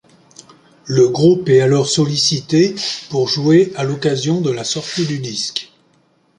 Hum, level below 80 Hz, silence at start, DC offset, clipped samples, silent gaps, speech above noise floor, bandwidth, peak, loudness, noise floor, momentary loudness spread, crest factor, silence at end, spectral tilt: none; -56 dBFS; 0.85 s; under 0.1%; under 0.1%; none; 42 dB; 11 kHz; -2 dBFS; -16 LUFS; -57 dBFS; 9 LU; 14 dB; 0.75 s; -5 dB/octave